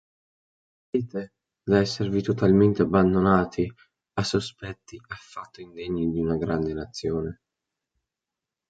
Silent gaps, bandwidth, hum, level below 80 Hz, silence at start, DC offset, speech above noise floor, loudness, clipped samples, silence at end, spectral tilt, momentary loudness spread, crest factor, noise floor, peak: none; 9.2 kHz; none; -48 dBFS; 0.95 s; under 0.1%; 63 dB; -24 LUFS; under 0.1%; 1.35 s; -7 dB/octave; 20 LU; 20 dB; -88 dBFS; -6 dBFS